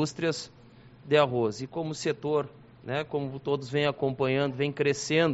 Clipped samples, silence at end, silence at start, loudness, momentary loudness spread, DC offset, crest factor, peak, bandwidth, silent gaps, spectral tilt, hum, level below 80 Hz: under 0.1%; 0 s; 0 s; -29 LUFS; 10 LU; under 0.1%; 18 dB; -10 dBFS; 8 kHz; none; -4.5 dB/octave; none; -64 dBFS